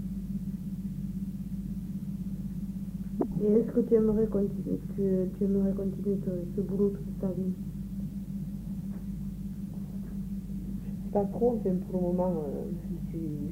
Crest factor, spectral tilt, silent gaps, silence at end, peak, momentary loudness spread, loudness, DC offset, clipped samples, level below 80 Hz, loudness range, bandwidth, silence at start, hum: 18 dB; -10 dB/octave; none; 0 s; -14 dBFS; 11 LU; -32 LUFS; under 0.1%; under 0.1%; -46 dBFS; 8 LU; 16 kHz; 0 s; 50 Hz at -45 dBFS